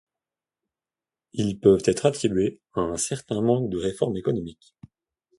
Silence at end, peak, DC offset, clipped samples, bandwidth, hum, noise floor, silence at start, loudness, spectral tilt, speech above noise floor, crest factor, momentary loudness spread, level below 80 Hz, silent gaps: 0.85 s; -4 dBFS; under 0.1%; under 0.1%; 11.5 kHz; none; under -90 dBFS; 1.35 s; -24 LUFS; -5.5 dB/octave; over 66 dB; 22 dB; 10 LU; -52 dBFS; none